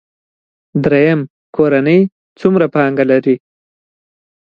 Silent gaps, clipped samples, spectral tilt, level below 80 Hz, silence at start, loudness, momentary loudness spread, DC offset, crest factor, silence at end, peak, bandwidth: 1.30-1.53 s, 2.12-2.36 s; under 0.1%; -9.5 dB/octave; -54 dBFS; 0.75 s; -13 LUFS; 8 LU; under 0.1%; 14 dB; 1.2 s; 0 dBFS; 6.8 kHz